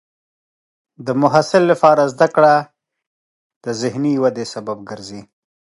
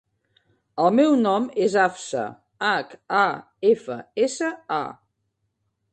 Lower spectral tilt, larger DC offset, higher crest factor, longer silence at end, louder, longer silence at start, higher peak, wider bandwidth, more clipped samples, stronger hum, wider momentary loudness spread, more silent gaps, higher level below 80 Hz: first, -6 dB/octave vs -4.5 dB/octave; neither; about the same, 18 dB vs 18 dB; second, 0.4 s vs 1 s; first, -15 LUFS vs -22 LUFS; first, 1 s vs 0.75 s; first, 0 dBFS vs -4 dBFS; first, 11.5 kHz vs 9.2 kHz; neither; neither; first, 18 LU vs 11 LU; first, 3.07-3.50 s, 3.56-3.61 s vs none; first, -64 dBFS vs -70 dBFS